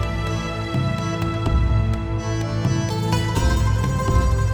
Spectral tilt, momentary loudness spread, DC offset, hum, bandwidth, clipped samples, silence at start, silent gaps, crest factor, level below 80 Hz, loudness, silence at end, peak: -6 dB/octave; 5 LU; under 0.1%; none; 19 kHz; under 0.1%; 0 s; none; 14 dB; -26 dBFS; -22 LUFS; 0 s; -6 dBFS